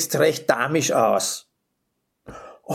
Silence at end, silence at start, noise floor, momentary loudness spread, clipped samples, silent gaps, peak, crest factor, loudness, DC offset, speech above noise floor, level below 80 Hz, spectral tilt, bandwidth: 0 s; 0 s; -75 dBFS; 22 LU; under 0.1%; none; -2 dBFS; 20 dB; -21 LUFS; under 0.1%; 55 dB; -62 dBFS; -3.5 dB/octave; 19 kHz